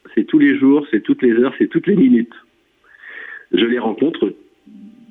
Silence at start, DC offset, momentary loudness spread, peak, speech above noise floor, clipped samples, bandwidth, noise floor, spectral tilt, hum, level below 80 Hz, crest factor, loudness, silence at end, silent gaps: 0.15 s; under 0.1%; 17 LU; -4 dBFS; 38 dB; under 0.1%; 3.9 kHz; -52 dBFS; -9.5 dB/octave; none; -62 dBFS; 12 dB; -15 LUFS; 0.2 s; none